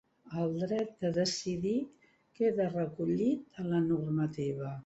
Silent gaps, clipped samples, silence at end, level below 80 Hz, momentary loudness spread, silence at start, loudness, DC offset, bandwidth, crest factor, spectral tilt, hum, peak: none; under 0.1%; 0.05 s; -68 dBFS; 6 LU; 0.25 s; -33 LUFS; under 0.1%; 8.2 kHz; 14 dB; -6.5 dB/octave; none; -18 dBFS